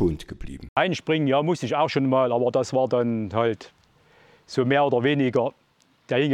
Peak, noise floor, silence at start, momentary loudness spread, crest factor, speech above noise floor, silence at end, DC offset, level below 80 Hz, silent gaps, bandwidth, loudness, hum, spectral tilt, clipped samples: -4 dBFS; -57 dBFS; 0 s; 9 LU; 18 dB; 35 dB; 0 s; under 0.1%; -50 dBFS; 0.69-0.76 s; 11 kHz; -23 LUFS; none; -6.5 dB/octave; under 0.1%